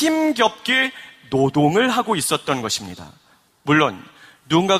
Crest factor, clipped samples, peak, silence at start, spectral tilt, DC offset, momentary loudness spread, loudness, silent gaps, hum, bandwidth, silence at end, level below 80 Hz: 20 dB; under 0.1%; 0 dBFS; 0 s; -4 dB/octave; under 0.1%; 16 LU; -19 LUFS; none; none; 15.5 kHz; 0 s; -58 dBFS